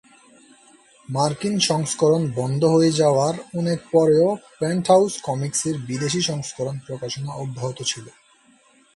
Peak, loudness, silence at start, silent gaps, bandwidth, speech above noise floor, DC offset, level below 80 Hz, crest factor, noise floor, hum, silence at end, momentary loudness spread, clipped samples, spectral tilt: -4 dBFS; -21 LUFS; 1.1 s; none; 11.5 kHz; 35 dB; under 0.1%; -60 dBFS; 18 dB; -56 dBFS; none; 0.85 s; 12 LU; under 0.1%; -5 dB/octave